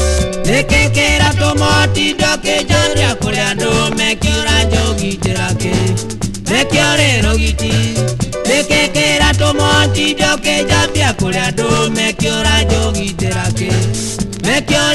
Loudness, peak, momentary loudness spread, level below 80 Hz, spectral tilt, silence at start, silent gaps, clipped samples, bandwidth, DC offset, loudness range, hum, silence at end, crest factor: -13 LUFS; 0 dBFS; 6 LU; -22 dBFS; -4 dB/octave; 0 s; none; under 0.1%; 12.5 kHz; under 0.1%; 2 LU; none; 0 s; 14 dB